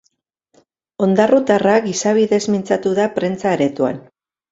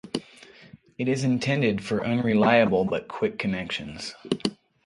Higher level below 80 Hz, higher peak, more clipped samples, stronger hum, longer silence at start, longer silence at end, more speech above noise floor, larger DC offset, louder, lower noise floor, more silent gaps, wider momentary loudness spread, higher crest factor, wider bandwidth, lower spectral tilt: about the same, -58 dBFS vs -58 dBFS; first, 0 dBFS vs -6 dBFS; neither; neither; first, 1 s vs 0.05 s; first, 0.5 s vs 0.3 s; first, 51 dB vs 27 dB; neither; first, -16 LUFS vs -25 LUFS; first, -67 dBFS vs -51 dBFS; neither; second, 7 LU vs 13 LU; about the same, 16 dB vs 20 dB; second, 7.8 kHz vs 11.5 kHz; about the same, -5.5 dB/octave vs -6 dB/octave